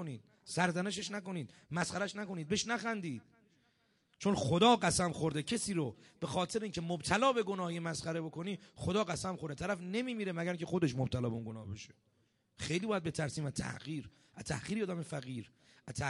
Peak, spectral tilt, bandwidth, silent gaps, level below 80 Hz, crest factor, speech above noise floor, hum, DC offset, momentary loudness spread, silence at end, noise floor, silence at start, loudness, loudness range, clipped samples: -14 dBFS; -4.5 dB/octave; 11.5 kHz; none; -62 dBFS; 22 dB; 39 dB; none; under 0.1%; 14 LU; 0 s; -75 dBFS; 0 s; -36 LUFS; 6 LU; under 0.1%